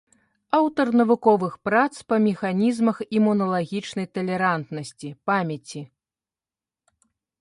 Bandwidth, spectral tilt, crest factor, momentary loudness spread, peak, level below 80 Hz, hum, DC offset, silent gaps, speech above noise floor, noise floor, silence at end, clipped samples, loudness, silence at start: 11.5 kHz; -6.5 dB/octave; 18 dB; 14 LU; -4 dBFS; -68 dBFS; none; under 0.1%; none; over 68 dB; under -90 dBFS; 1.55 s; under 0.1%; -22 LUFS; 0.55 s